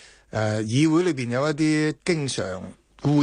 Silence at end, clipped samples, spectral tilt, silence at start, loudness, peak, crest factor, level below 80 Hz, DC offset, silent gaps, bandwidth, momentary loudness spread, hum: 0 s; under 0.1%; -6 dB/octave; 0.35 s; -24 LUFS; -8 dBFS; 16 dB; -56 dBFS; under 0.1%; none; 10 kHz; 12 LU; none